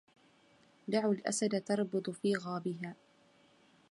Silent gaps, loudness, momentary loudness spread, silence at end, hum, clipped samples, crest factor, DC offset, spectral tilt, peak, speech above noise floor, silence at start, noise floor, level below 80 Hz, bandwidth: none; -35 LUFS; 10 LU; 0.95 s; none; under 0.1%; 18 dB; under 0.1%; -5 dB/octave; -18 dBFS; 32 dB; 0.85 s; -66 dBFS; -84 dBFS; 11.5 kHz